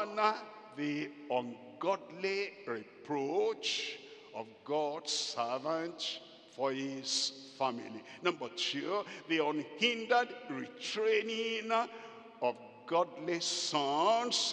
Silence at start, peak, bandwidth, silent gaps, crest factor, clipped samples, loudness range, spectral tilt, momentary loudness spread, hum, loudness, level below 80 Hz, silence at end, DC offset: 0 s; -14 dBFS; 10.5 kHz; none; 20 dB; under 0.1%; 3 LU; -2.5 dB/octave; 12 LU; none; -35 LUFS; under -90 dBFS; 0 s; under 0.1%